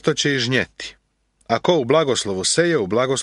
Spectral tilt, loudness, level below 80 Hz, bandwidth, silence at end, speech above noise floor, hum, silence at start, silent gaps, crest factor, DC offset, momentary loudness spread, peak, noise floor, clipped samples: -3.5 dB/octave; -19 LUFS; -56 dBFS; 11.5 kHz; 0 s; 45 dB; none; 0.05 s; none; 18 dB; under 0.1%; 9 LU; -2 dBFS; -64 dBFS; under 0.1%